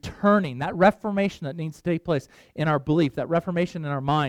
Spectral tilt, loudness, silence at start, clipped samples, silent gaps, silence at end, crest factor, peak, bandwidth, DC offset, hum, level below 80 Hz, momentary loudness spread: -7.5 dB/octave; -24 LUFS; 0.05 s; under 0.1%; none; 0 s; 18 dB; -6 dBFS; 12 kHz; under 0.1%; none; -52 dBFS; 9 LU